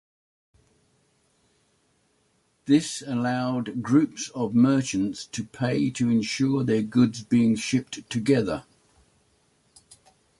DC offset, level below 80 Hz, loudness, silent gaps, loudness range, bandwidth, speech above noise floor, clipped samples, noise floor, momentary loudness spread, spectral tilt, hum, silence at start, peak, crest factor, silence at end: under 0.1%; -60 dBFS; -24 LUFS; none; 5 LU; 11.5 kHz; 44 dB; under 0.1%; -68 dBFS; 8 LU; -5.5 dB/octave; none; 2.65 s; -8 dBFS; 18 dB; 1.8 s